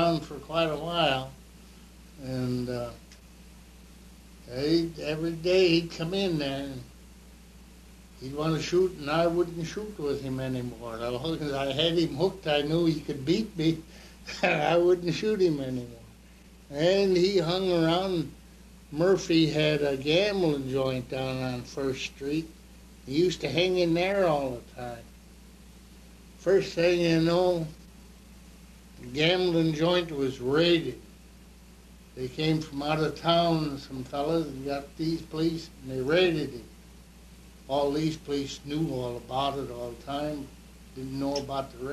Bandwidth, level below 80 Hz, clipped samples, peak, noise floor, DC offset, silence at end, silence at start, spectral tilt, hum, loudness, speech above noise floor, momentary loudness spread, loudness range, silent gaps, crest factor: 13.5 kHz; -52 dBFS; under 0.1%; -10 dBFS; -52 dBFS; under 0.1%; 0 s; 0 s; -6 dB/octave; none; -28 LUFS; 25 dB; 14 LU; 5 LU; none; 18 dB